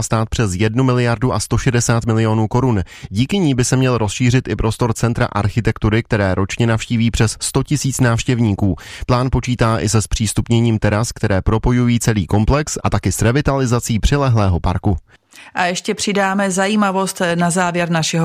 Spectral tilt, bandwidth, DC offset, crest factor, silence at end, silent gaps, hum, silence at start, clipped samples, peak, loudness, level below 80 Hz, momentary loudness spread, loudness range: -5.5 dB/octave; 15 kHz; under 0.1%; 14 dB; 0 s; none; none; 0 s; under 0.1%; -2 dBFS; -17 LUFS; -30 dBFS; 4 LU; 1 LU